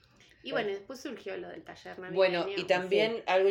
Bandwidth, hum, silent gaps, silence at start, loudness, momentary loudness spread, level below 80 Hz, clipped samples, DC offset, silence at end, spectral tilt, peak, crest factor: 16.5 kHz; none; none; 0.45 s; -30 LUFS; 17 LU; -72 dBFS; under 0.1%; under 0.1%; 0 s; -5 dB/octave; -12 dBFS; 20 dB